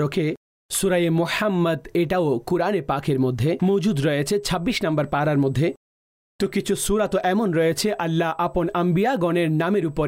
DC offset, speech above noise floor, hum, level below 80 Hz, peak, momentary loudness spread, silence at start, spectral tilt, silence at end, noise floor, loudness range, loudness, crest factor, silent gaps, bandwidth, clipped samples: under 0.1%; over 69 dB; none; -46 dBFS; -12 dBFS; 4 LU; 0 s; -5.5 dB/octave; 0 s; under -90 dBFS; 1 LU; -22 LUFS; 10 dB; 0.37-0.69 s, 5.77-6.39 s; 16 kHz; under 0.1%